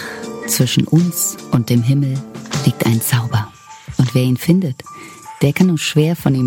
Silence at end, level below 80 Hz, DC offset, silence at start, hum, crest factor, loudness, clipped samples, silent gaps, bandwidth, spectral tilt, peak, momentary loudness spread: 0 s; -50 dBFS; under 0.1%; 0 s; none; 14 dB; -16 LUFS; under 0.1%; none; 17 kHz; -5.5 dB/octave; -2 dBFS; 13 LU